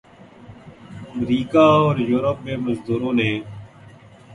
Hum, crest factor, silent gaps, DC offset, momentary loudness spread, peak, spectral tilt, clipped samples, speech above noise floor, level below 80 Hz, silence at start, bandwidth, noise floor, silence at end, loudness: none; 20 dB; none; under 0.1%; 24 LU; -2 dBFS; -7.5 dB/octave; under 0.1%; 26 dB; -52 dBFS; 0.4 s; 10.5 kHz; -45 dBFS; 0 s; -19 LUFS